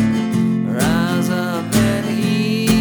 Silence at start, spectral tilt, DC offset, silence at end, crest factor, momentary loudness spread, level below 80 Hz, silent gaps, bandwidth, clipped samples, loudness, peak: 0 s; -5.5 dB/octave; under 0.1%; 0 s; 14 dB; 2 LU; -40 dBFS; none; over 20 kHz; under 0.1%; -18 LUFS; -2 dBFS